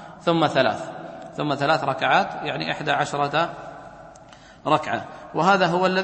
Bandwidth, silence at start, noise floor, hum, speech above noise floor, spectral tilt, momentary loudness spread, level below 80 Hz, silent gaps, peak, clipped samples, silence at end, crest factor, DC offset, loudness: 8.8 kHz; 0 s; -47 dBFS; none; 25 dB; -5 dB/octave; 16 LU; -60 dBFS; none; -4 dBFS; under 0.1%; 0 s; 20 dB; under 0.1%; -22 LUFS